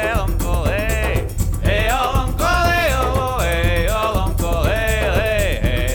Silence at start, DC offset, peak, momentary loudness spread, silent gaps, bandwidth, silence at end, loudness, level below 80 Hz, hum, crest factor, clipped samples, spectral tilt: 0 s; under 0.1%; -4 dBFS; 4 LU; none; over 20 kHz; 0 s; -18 LUFS; -22 dBFS; none; 14 dB; under 0.1%; -5 dB/octave